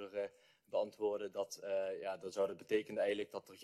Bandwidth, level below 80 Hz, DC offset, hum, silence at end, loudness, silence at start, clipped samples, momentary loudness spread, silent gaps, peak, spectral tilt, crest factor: 13.5 kHz; -84 dBFS; under 0.1%; none; 0 s; -40 LUFS; 0 s; under 0.1%; 7 LU; none; -24 dBFS; -4 dB/octave; 18 dB